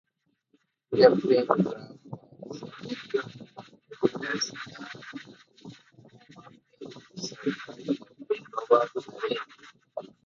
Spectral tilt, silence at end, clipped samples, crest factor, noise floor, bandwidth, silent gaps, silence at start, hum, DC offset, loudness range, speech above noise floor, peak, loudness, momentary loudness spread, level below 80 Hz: -5 dB/octave; 0.2 s; under 0.1%; 26 dB; -71 dBFS; 7.4 kHz; none; 0.9 s; none; under 0.1%; 11 LU; 44 dB; -4 dBFS; -27 LUFS; 23 LU; -72 dBFS